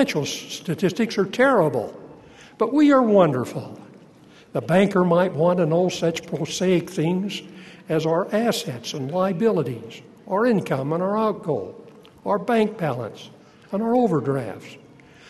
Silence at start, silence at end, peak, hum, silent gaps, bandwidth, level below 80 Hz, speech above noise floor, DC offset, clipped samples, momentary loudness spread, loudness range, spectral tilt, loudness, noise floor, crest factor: 0 s; 0.55 s; -4 dBFS; none; none; 13 kHz; -64 dBFS; 28 dB; under 0.1%; under 0.1%; 17 LU; 4 LU; -6 dB/octave; -22 LUFS; -49 dBFS; 18 dB